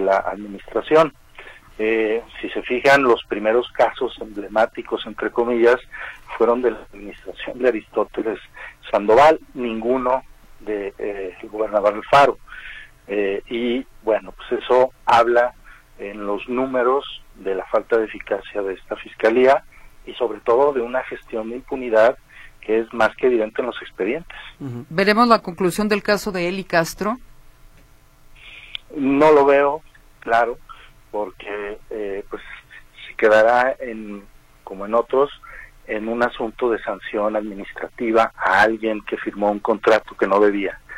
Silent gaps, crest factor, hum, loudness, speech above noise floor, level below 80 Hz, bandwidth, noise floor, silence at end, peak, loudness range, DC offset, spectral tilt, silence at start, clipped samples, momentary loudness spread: none; 20 dB; none; -20 LUFS; 30 dB; -48 dBFS; 15.5 kHz; -49 dBFS; 0 s; 0 dBFS; 4 LU; under 0.1%; -5 dB/octave; 0 s; under 0.1%; 18 LU